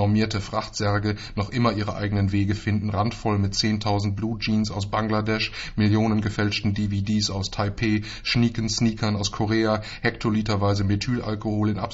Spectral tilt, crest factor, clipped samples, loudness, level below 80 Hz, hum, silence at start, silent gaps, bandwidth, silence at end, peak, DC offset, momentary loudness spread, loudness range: -5.5 dB/octave; 16 dB; under 0.1%; -24 LUFS; -42 dBFS; none; 0 s; none; 8 kHz; 0 s; -8 dBFS; under 0.1%; 5 LU; 1 LU